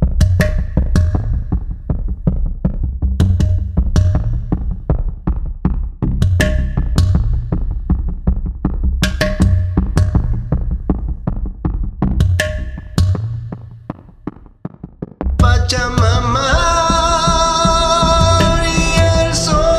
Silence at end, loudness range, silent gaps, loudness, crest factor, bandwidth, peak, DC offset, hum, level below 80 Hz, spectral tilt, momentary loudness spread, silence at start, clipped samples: 0 s; 7 LU; none; -16 LUFS; 14 dB; 14.5 kHz; 0 dBFS; under 0.1%; none; -18 dBFS; -5.5 dB/octave; 11 LU; 0 s; under 0.1%